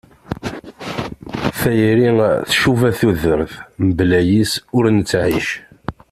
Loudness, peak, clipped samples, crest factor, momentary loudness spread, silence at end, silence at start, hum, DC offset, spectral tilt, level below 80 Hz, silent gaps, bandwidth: -16 LUFS; -2 dBFS; under 0.1%; 14 dB; 14 LU; 0.2 s; 0.3 s; none; under 0.1%; -6 dB/octave; -40 dBFS; none; 15.5 kHz